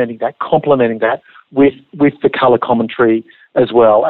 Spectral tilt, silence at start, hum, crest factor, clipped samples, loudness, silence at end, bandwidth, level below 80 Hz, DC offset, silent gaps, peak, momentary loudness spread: -10.5 dB/octave; 0 s; none; 12 dB; under 0.1%; -14 LUFS; 0 s; 4.3 kHz; -52 dBFS; under 0.1%; none; 0 dBFS; 8 LU